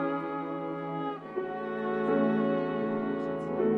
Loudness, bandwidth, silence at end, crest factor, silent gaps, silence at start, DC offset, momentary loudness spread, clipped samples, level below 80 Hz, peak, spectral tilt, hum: -31 LUFS; 5.4 kHz; 0 s; 14 dB; none; 0 s; under 0.1%; 8 LU; under 0.1%; -70 dBFS; -16 dBFS; -9 dB/octave; none